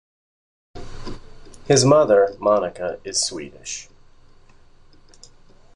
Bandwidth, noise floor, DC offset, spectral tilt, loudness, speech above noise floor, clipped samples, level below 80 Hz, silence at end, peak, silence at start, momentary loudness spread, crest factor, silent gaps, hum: 11.5 kHz; -48 dBFS; under 0.1%; -4 dB/octave; -19 LUFS; 30 dB; under 0.1%; -48 dBFS; 1.9 s; -2 dBFS; 0.75 s; 24 LU; 20 dB; none; none